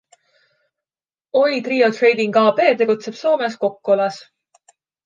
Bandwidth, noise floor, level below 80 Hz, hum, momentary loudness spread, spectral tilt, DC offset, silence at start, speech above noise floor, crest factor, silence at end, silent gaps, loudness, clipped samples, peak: 7.8 kHz; under -90 dBFS; -76 dBFS; none; 7 LU; -5 dB/octave; under 0.1%; 1.35 s; over 73 dB; 16 dB; 0.85 s; none; -17 LUFS; under 0.1%; -2 dBFS